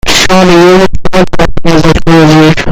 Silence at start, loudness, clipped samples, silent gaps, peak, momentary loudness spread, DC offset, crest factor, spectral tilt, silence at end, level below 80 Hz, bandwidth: 0.05 s; -5 LUFS; 10%; none; 0 dBFS; 7 LU; under 0.1%; 4 dB; -5 dB/octave; 0 s; -18 dBFS; 16 kHz